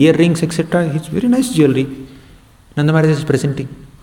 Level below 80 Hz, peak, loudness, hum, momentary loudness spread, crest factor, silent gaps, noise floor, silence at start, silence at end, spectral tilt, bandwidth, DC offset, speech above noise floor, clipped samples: -46 dBFS; -2 dBFS; -15 LUFS; none; 12 LU; 14 dB; none; -44 dBFS; 0 s; 0.15 s; -6.5 dB/octave; 16 kHz; under 0.1%; 30 dB; under 0.1%